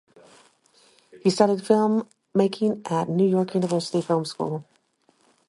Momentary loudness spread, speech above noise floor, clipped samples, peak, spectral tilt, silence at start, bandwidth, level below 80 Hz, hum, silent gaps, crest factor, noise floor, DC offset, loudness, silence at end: 8 LU; 42 dB; under 0.1%; -4 dBFS; -6.5 dB/octave; 1.15 s; 11.5 kHz; -70 dBFS; none; none; 20 dB; -65 dBFS; under 0.1%; -23 LUFS; 0.85 s